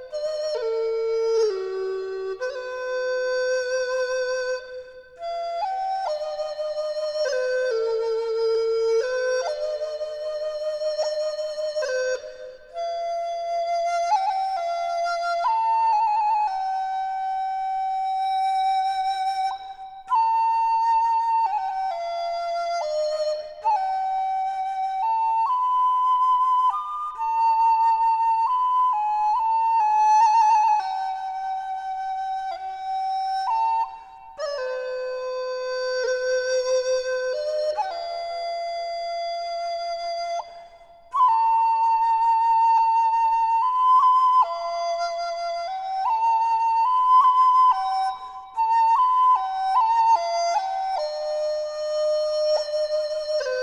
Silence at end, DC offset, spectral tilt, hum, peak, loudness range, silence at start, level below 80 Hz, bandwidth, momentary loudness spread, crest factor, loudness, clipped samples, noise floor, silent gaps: 0 s; under 0.1%; -1 dB/octave; none; -10 dBFS; 8 LU; 0 s; -62 dBFS; 10.5 kHz; 11 LU; 14 dB; -23 LUFS; under 0.1%; -48 dBFS; none